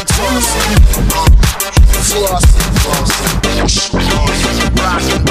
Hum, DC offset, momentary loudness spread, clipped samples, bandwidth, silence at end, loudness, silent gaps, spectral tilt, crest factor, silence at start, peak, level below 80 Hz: none; under 0.1%; 3 LU; 0.7%; 16 kHz; 0 s; -11 LUFS; none; -4 dB/octave; 10 dB; 0 s; 0 dBFS; -12 dBFS